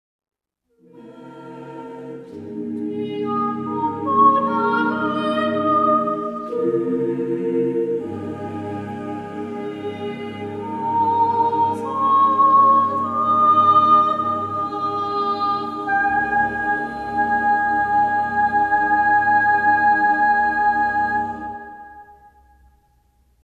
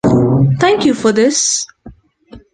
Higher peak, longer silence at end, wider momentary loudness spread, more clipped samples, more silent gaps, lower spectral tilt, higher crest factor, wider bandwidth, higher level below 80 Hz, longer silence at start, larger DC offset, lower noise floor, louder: about the same, -4 dBFS vs -2 dBFS; first, 1.35 s vs 0.15 s; first, 15 LU vs 5 LU; neither; neither; first, -7 dB/octave vs -4.5 dB/octave; about the same, 16 dB vs 12 dB; about the same, 9.6 kHz vs 10 kHz; second, -54 dBFS vs -42 dBFS; first, 0.95 s vs 0.05 s; neither; first, -66 dBFS vs -40 dBFS; second, -19 LUFS vs -12 LUFS